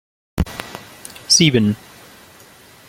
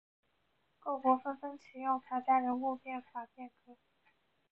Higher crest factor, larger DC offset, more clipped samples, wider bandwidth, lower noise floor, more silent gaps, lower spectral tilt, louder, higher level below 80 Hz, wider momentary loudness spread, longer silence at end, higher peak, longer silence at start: about the same, 20 dB vs 20 dB; neither; neither; first, 17 kHz vs 5.8 kHz; second, -45 dBFS vs -78 dBFS; neither; about the same, -3.5 dB/octave vs -3.5 dB/octave; first, -16 LUFS vs -35 LUFS; first, -38 dBFS vs -84 dBFS; first, 23 LU vs 16 LU; first, 1.15 s vs 0.75 s; first, -2 dBFS vs -16 dBFS; second, 0.35 s vs 0.85 s